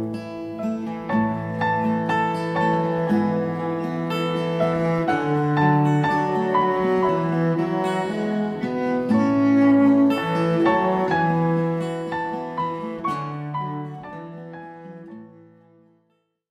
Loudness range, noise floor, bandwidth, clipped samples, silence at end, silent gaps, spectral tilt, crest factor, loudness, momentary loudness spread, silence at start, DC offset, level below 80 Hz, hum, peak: 10 LU; -69 dBFS; 12.5 kHz; under 0.1%; 1.25 s; none; -8 dB/octave; 14 dB; -22 LUFS; 13 LU; 0 s; under 0.1%; -58 dBFS; none; -8 dBFS